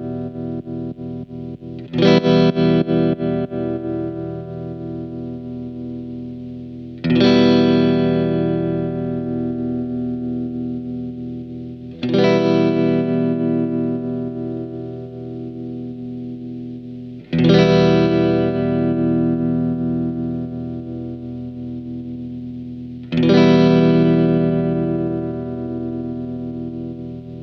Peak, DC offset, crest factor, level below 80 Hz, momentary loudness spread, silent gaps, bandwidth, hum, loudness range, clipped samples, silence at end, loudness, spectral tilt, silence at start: 0 dBFS; under 0.1%; 18 dB; -46 dBFS; 17 LU; none; 6.4 kHz; none; 9 LU; under 0.1%; 0 s; -19 LUFS; -8.5 dB/octave; 0 s